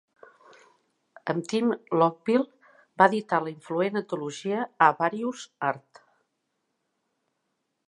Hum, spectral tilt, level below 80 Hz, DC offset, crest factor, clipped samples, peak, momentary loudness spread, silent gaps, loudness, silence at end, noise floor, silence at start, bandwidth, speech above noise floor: none; -5.5 dB/octave; -82 dBFS; under 0.1%; 26 dB; under 0.1%; -2 dBFS; 11 LU; none; -26 LUFS; 2.1 s; -78 dBFS; 1.25 s; 11 kHz; 53 dB